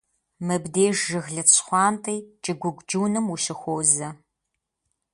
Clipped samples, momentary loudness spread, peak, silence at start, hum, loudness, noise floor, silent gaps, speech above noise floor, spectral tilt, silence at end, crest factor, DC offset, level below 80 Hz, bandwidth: under 0.1%; 13 LU; -2 dBFS; 0.4 s; none; -22 LUFS; -81 dBFS; none; 57 dB; -3 dB/octave; 1 s; 22 dB; under 0.1%; -66 dBFS; 11.5 kHz